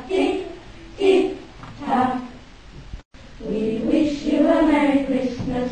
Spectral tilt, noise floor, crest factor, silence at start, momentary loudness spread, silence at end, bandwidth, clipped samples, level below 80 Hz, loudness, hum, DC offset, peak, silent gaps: -6.5 dB/octave; -42 dBFS; 16 dB; 0 s; 23 LU; 0 s; 9.4 kHz; under 0.1%; -44 dBFS; -21 LUFS; none; 0.3%; -6 dBFS; 3.05-3.11 s